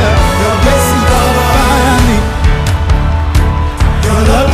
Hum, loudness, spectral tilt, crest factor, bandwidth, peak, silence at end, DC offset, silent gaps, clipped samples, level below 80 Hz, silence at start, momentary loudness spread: none; -10 LUFS; -5.5 dB/octave; 8 dB; 15.5 kHz; 0 dBFS; 0 s; under 0.1%; none; under 0.1%; -12 dBFS; 0 s; 4 LU